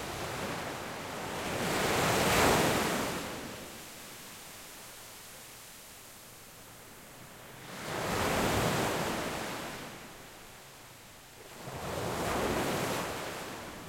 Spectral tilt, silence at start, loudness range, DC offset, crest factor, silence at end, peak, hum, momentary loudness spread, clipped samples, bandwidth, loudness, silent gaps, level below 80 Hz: -3.5 dB/octave; 0 s; 16 LU; under 0.1%; 22 dB; 0 s; -12 dBFS; none; 21 LU; under 0.1%; 16.5 kHz; -32 LUFS; none; -54 dBFS